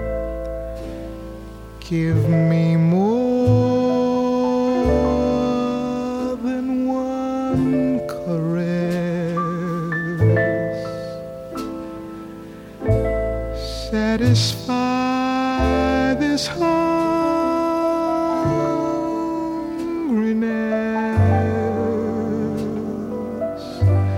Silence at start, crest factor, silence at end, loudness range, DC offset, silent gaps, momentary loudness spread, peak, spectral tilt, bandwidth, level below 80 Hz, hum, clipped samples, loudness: 0 s; 16 dB; 0 s; 5 LU; under 0.1%; none; 13 LU; -4 dBFS; -7 dB/octave; 16 kHz; -36 dBFS; none; under 0.1%; -20 LUFS